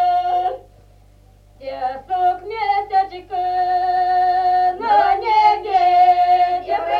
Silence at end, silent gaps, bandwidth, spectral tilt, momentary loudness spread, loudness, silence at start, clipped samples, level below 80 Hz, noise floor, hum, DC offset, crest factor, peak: 0 s; none; 6 kHz; -4.5 dB/octave; 12 LU; -17 LUFS; 0 s; under 0.1%; -50 dBFS; -48 dBFS; 50 Hz at -50 dBFS; under 0.1%; 14 dB; -4 dBFS